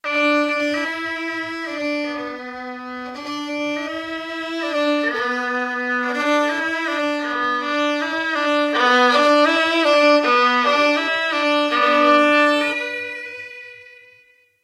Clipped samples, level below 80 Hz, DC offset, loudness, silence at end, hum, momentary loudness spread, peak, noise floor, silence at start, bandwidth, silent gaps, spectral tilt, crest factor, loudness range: under 0.1%; -66 dBFS; under 0.1%; -18 LUFS; 0.7 s; none; 15 LU; -2 dBFS; -55 dBFS; 0.05 s; 13.5 kHz; none; -2 dB/octave; 16 dB; 10 LU